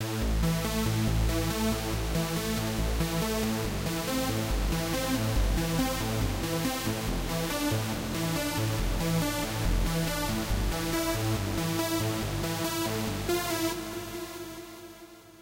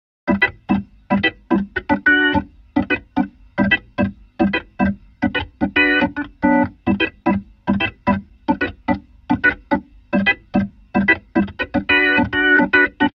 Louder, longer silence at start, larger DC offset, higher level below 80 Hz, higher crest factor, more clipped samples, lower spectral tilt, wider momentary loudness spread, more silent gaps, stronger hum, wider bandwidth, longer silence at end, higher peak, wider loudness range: second, -30 LUFS vs -18 LUFS; second, 0 s vs 0.25 s; neither; first, -36 dBFS vs -42 dBFS; about the same, 14 dB vs 18 dB; neither; second, -4.5 dB/octave vs -8 dB/octave; second, 3 LU vs 9 LU; neither; neither; first, 16 kHz vs 5.8 kHz; about the same, 0 s vs 0.05 s; second, -16 dBFS vs -2 dBFS; about the same, 1 LU vs 3 LU